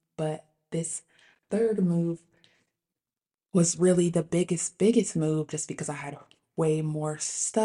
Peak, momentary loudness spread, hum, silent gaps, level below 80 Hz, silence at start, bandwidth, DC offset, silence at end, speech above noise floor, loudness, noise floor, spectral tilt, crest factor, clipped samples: -10 dBFS; 14 LU; none; none; -66 dBFS; 0.2 s; 11.5 kHz; under 0.1%; 0 s; over 64 dB; -27 LUFS; under -90 dBFS; -5.5 dB/octave; 18 dB; under 0.1%